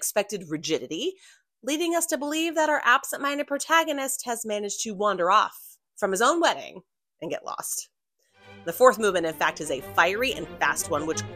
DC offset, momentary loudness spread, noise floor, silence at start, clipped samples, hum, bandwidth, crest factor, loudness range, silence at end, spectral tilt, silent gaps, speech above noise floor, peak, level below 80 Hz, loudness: under 0.1%; 12 LU; -66 dBFS; 0 s; under 0.1%; none; 16 kHz; 24 dB; 2 LU; 0 s; -2.5 dB/octave; none; 41 dB; -2 dBFS; -62 dBFS; -25 LUFS